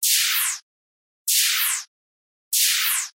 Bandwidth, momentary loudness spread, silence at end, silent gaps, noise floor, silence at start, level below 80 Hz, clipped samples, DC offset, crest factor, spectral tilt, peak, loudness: 16 kHz; 10 LU; 0.1 s; 0.62-1.25 s, 1.88-2.51 s; under -90 dBFS; 0 s; -84 dBFS; under 0.1%; under 0.1%; 18 dB; 8.5 dB/octave; -6 dBFS; -19 LUFS